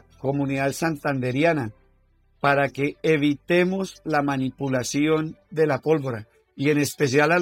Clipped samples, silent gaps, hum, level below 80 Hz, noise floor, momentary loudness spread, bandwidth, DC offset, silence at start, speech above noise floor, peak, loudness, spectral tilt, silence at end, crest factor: under 0.1%; none; none; -58 dBFS; -61 dBFS; 6 LU; 17 kHz; under 0.1%; 0.25 s; 39 dB; -6 dBFS; -23 LUFS; -5.5 dB/octave; 0 s; 16 dB